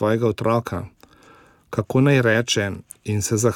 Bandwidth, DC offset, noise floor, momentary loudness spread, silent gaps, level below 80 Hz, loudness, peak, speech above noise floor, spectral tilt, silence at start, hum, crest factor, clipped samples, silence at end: 17.5 kHz; under 0.1%; -51 dBFS; 14 LU; none; -54 dBFS; -21 LUFS; -4 dBFS; 31 dB; -5 dB/octave; 0 s; none; 16 dB; under 0.1%; 0 s